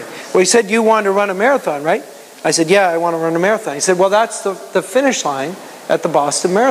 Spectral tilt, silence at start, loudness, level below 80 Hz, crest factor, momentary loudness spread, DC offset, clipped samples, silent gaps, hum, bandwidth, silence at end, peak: -3.5 dB/octave; 0 s; -15 LUFS; -72 dBFS; 14 dB; 9 LU; under 0.1%; under 0.1%; none; none; 15.5 kHz; 0 s; 0 dBFS